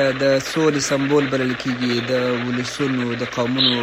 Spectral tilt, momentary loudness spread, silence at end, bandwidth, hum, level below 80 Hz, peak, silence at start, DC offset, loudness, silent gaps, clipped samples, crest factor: -4.5 dB/octave; 5 LU; 0 s; 15.5 kHz; none; -54 dBFS; -4 dBFS; 0 s; under 0.1%; -20 LUFS; none; under 0.1%; 16 dB